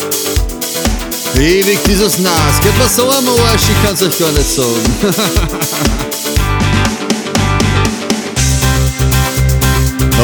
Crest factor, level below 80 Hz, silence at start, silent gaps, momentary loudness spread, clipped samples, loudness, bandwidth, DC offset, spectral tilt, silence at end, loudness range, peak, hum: 12 dB; -20 dBFS; 0 s; none; 6 LU; under 0.1%; -12 LUFS; over 20 kHz; under 0.1%; -4 dB/octave; 0 s; 3 LU; 0 dBFS; none